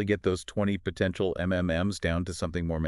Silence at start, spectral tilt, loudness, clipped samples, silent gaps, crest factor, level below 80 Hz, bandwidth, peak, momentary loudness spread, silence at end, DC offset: 0 s; -6 dB/octave; -29 LUFS; under 0.1%; none; 16 dB; -44 dBFS; 12 kHz; -12 dBFS; 3 LU; 0 s; under 0.1%